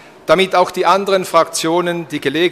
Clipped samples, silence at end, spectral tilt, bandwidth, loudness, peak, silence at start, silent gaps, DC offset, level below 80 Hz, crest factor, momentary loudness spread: under 0.1%; 0 s; -4 dB/octave; 15 kHz; -15 LUFS; 0 dBFS; 0.25 s; none; under 0.1%; -54 dBFS; 14 dB; 6 LU